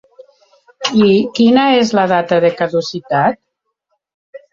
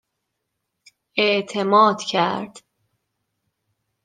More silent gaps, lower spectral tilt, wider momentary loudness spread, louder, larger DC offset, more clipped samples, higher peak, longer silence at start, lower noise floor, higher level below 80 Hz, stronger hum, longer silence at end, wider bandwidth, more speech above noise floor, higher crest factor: first, 4.14-4.33 s vs none; about the same, -5.5 dB/octave vs -4.5 dB/octave; second, 8 LU vs 13 LU; first, -13 LUFS vs -19 LUFS; neither; neither; first, 0 dBFS vs -4 dBFS; second, 0.8 s vs 1.15 s; second, -71 dBFS vs -78 dBFS; first, -56 dBFS vs -74 dBFS; neither; second, 0.15 s vs 1.45 s; second, 7.6 kHz vs 9.6 kHz; about the same, 59 dB vs 59 dB; second, 14 dB vs 20 dB